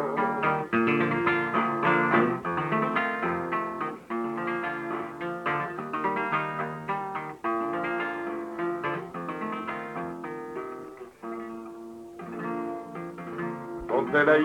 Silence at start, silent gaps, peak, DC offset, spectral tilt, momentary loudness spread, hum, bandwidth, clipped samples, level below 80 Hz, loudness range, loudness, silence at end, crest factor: 0 s; none; -10 dBFS; under 0.1%; -7 dB/octave; 14 LU; none; 11 kHz; under 0.1%; -64 dBFS; 11 LU; -29 LUFS; 0 s; 18 dB